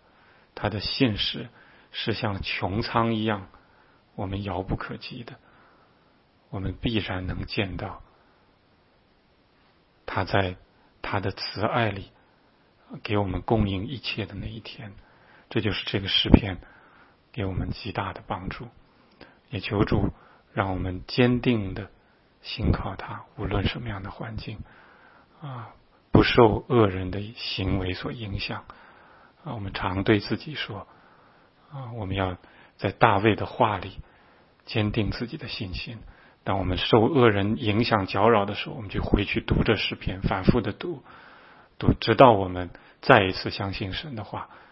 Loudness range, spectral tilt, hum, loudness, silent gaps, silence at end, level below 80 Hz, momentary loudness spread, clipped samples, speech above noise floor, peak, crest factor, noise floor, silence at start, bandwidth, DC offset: 10 LU; -9.5 dB/octave; none; -26 LUFS; none; 0.15 s; -40 dBFS; 19 LU; under 0.1%; 37 dB; 0 dBFS; 26 dB; -62 dBFS; 0.55 s; 5.8 kHz; under 0.1%